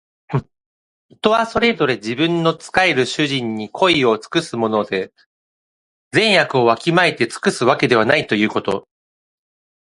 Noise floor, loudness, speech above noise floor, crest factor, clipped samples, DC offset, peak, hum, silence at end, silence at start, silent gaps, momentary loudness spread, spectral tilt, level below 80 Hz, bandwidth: under -90 dBFS; -17 LUFS; over 73 dB; 18 dB; under 0.1%; under 0.1%; 0 dBFS; none; 1 s; 0.3 s; 0.66-1.09 s, 5.26-6.11 s; 10 LU; -5 dB/octave; -54 dBFS; 11.5 kHz